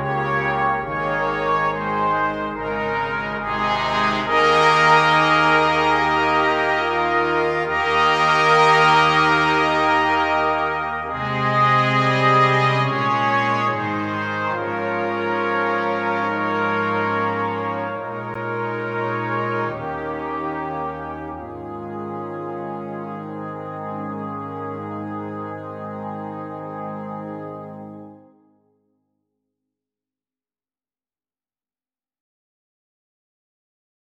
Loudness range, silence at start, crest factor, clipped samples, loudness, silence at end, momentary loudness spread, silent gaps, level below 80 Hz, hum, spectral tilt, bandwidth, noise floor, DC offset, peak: 14 LU; 0 s; 18 dB; under 0.1%; -19 LUFS; 6 s; 16 LU; none; -50 dBFS; none; -5.5 dB/octave; 12 kHz; under -90 dBFS; under 0.1%; -2 dBFS